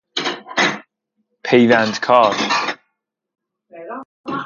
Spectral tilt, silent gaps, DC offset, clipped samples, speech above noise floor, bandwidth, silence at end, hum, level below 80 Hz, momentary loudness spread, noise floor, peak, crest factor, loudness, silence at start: -4 dB/octave; 4.05-4.24 s; under 0.1%; under 0.1%; 61 dB; 7.4 kHz; 0 s; none; -66 dBFS; 19 LU; -75 dBFS; 0 dBFS; 18 dB; -16 LUFS; 0.15 s